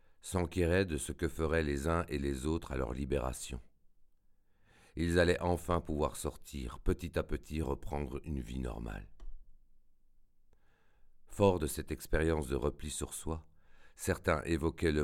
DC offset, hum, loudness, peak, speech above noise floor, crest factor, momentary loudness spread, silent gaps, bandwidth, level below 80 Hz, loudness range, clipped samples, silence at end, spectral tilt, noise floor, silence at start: under 0.1%; none; -35 LUFS; -14 dBFS; 32 dB; 22 dB; 13 LU; none; 16.5 kHz; -44 dBFS; 7 LU; under 0.1%; 0 s; -5.5 dB/octave; -66 dBFS; 0.25 s